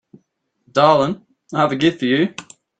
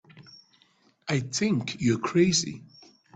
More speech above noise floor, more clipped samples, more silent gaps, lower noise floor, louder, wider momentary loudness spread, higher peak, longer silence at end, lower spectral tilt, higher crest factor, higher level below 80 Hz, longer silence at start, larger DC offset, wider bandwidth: first, 50 dB vs 39 dB; neither; neither; about the same, -66 dBFS vs -64 dBFS; first, -17 LUFS vs -26 LUFS; about the same, 13 LU vs 15 LU; first, 0 dBFS vs -10 dBFS; second, 0.4 s vs 0.55 s; first, -6 dB/octave vs -4.5 dB/octave; about the same, 18 dB vs 18 dB; about the same, -58 dBFS vs -60 dBFS; first, 0.75 s vs 0.15 s; neither; about the same, 9 kHz vs 9.2 kHz